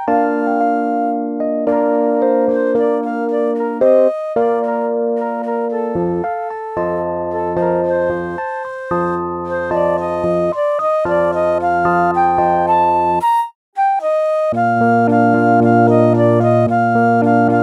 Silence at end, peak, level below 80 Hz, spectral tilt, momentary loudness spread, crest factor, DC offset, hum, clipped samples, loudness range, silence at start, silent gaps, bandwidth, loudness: 0 s; 0 dBFS; -50 dBFS; -9 dB/octave; 8 LU; 14 dB; under 0.1%; none; under 0.1%; 6 LU; 0 s; 13.55-13.72 s; 11 kHz; -16 LUFS